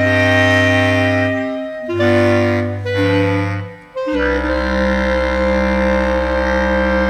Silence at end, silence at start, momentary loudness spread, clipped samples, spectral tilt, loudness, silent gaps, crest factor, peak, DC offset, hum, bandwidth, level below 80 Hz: 0 s; 0 s; 10 LU; under 0.1%; -6.5 dB/octave; -15 LUFS; none; 14 dB; -2 dBFS; under 0.1%; 50 Hz at -55 dBFS; 13.5 kHz; -28 dBFS